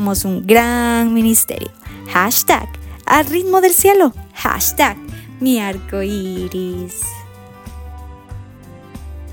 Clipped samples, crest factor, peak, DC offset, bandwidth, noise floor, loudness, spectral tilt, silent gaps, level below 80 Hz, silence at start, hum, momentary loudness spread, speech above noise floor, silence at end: under 0.1%; 16 dB; 0 dBFS; under 0.1%; 18 kHz; -38 dBFS; -15 LUFS; -3.5 dB/octave; none; -36 dBFS; 0 s; none; 23 LU; 23 dB; 0 s